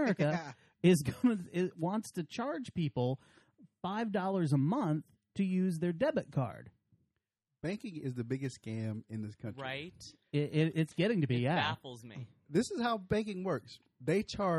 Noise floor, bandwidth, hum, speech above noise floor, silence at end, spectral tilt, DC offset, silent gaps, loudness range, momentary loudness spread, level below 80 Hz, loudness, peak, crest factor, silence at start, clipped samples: -87 dBFS; 13 kHz; none; 53 dB; 0 s; -6.5 dB/octave; under 0.1%; none; 7 LU; 13 LU; -66 dBFS; -35 LUFS; -16 dBFS; 20 dB; 0 s; under 0.1%